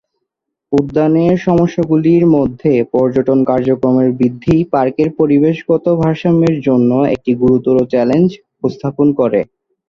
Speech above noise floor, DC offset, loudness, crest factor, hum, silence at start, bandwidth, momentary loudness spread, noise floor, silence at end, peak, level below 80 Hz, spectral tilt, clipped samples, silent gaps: 63 dB; under 0.1%; -13 LUFS; 12 dB; none; 0.7 s; 7 kHz; 4 LU; -75 dBFS; 0.45 s; 0 dBFS; -44 dBFS; -9.5 dB/octave; under 0.1%; none